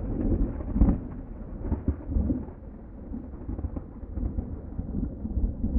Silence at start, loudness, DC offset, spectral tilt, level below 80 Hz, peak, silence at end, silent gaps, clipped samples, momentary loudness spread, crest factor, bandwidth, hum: 0 s; -32 LUFS; under 0.1%; -13.5 dB/octave; -32 dBFS; -8 dBFS; 0 s; none; under 0.1%; 14 LU; 20 dB; 2.5 kHz; none